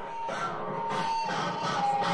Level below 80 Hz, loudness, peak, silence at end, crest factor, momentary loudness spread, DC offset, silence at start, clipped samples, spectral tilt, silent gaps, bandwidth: -66 dBFS; -31 LUFS; -16 dBFS; 0 s; 16 dB; 5 LU; under 0.1%; 0 s; under 0.1%; -4 dB/octave; none; 11.5 kHz